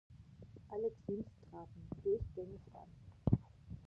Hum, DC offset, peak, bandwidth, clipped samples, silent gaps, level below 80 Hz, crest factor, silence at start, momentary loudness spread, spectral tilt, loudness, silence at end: none; under 0.1%; -18 dBFS; 6.4 kHz; under 0.1%; none; -56 dBFS; 26 dB; 0.1 s; 21 LU; -11.5 dB/octave; -42 LUFS; 0 s